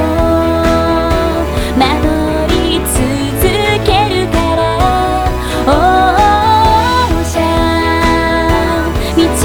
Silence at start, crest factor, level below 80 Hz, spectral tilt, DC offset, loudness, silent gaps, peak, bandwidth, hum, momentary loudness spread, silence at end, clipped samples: 0 s; 10 dB; -20 dBFS; -5 dB/octave; under 0.1%; -11 LUFS; none; 0 dBFS; over 20 kHz; none; 5 LU; 0 s; under 0.1%